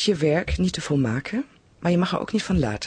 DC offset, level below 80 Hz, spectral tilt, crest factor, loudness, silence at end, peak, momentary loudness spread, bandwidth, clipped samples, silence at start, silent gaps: under 0.1%; -38 dBFS; -6 dB/octave; 14 dB; -24 LUFS; 0 s; -8 dBFS; 8 LU; 10 kHz; under 0.1%; 0 s; none